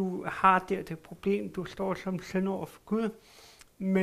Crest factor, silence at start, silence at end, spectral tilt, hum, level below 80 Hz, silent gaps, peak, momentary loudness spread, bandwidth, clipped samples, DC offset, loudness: 22 dB; 0 s; 0 s; -7 dB/octave; none; -60 dBFS; none; -8 dBFS; 13 LU; 14.5 kHz; under 0.1%; under 0.1%; -31 LUFS